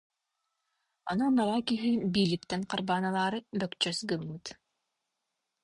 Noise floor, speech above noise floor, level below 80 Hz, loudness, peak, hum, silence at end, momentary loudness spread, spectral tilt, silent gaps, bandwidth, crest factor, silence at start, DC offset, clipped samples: -84 dBFS; 54 dB; -66 dBFS; -30 LUFS; -14 dBFS; none; 1.1 s; 10 LU; -5 dB/octave; none; 11.5 kHz; 18 dB; 1.05 s; under 0.1%; under 0.1%